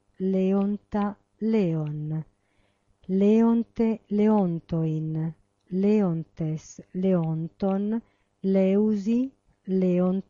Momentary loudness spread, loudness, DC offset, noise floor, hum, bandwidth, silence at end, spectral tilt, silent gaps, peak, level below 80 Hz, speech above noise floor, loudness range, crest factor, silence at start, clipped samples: 11 LU; -26 LUFS; under 0.1%; -68 dBFS; none; 7.2 kHz; 0.1 s; -9.5 dB/octave; none; -12 dBFS; -58 dBFS; 44 dB; 3 LU; 12 dB; 0.2 s; under 0.1%